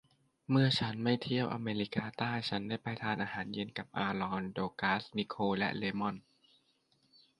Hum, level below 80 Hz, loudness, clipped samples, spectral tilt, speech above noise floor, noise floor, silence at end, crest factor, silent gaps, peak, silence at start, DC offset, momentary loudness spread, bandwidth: none; -68 dBFS; -35 LUFS; under 0.1%; -6.5 dB/octave; 39 dB; -74 dBFS; 1.2 s; 20 dB; none; -16 dBFS; 0.5 s; under 0.1%; 8 LU; 11 kHz